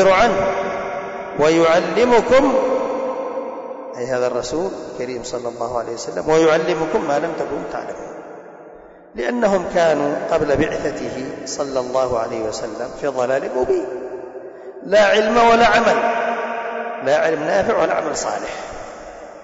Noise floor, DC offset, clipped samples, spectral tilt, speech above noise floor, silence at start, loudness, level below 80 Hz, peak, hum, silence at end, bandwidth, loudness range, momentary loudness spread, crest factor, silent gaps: -41 dBFS; under 0.1%; under 0.1%; -4.5 dB/octave; 24 dB; 0 s; -18 LUFS; -46 dBFS; -6 dBFS; none; 0 s; 8 kHz; 6 LU; 17 LU; 12 dB; none